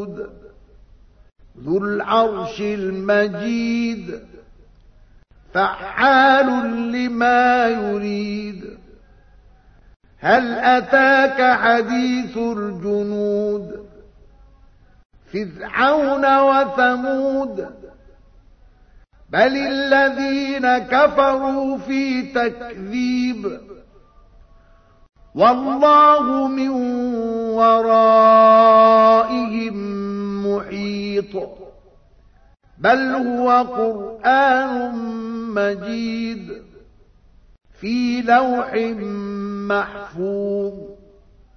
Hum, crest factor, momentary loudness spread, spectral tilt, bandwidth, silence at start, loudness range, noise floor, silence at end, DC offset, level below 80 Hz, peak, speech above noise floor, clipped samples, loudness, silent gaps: none; 18 dB; 15 LU; -6 dB/octave; 6.6 kHz; 0 s; 10 LU; -51 dBFS; 0.6 s; under 0.1%; -50 dBFS; 0 dBFS; 34 dB; under 0.1%; -17 LUFS; 9.96-10.00 s, 15.05-15.10 s